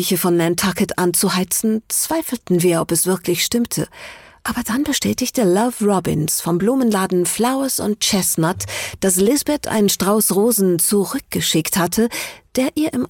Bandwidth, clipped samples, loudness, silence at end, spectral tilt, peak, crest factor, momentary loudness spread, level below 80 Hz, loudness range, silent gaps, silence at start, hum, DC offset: 17.5 kHz; under 0.1%; -17 LUFS; 0 s; -4 dB/octave; -6 dBFS; 12 dB; 7 LU; -48 dBFS; 3 LU; none; 0 s; none; under 0.1%